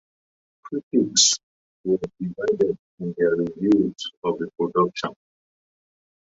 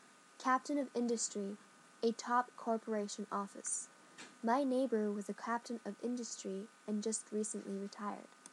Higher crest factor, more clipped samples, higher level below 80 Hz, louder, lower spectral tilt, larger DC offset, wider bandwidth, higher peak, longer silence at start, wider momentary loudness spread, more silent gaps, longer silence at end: about the same, 20 dB vs 20 dB; neither; first, -62 dBFS vs under -90 dBFS; first, -23 LUFS vs -39 LUFS; about the same, -3.5 dB/octave vs -4 dB/octave; neither; second, 8 kHz vs 12 kHz; first, -4 dBFS vs -20 dBFS; first, 0.65 s vs 0 s; first, 15 LU vs 11 LU; first, 0.83-0.91 s, 1.43-1.84 s, 2.79-2.98 s, 4.17-4.22 s vs none; first, 1.25 s vs 0.05 s